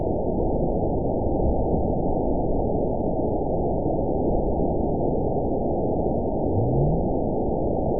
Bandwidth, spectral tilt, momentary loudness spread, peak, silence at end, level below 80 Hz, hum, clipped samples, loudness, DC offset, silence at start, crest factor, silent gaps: 1 kHz; -19 dB/octave; 2 LU; -10 dBFS; 0 s; -32 dBFS; none; under 0.1%; -24 LUFS; 3%; 0 s; 12 dB; none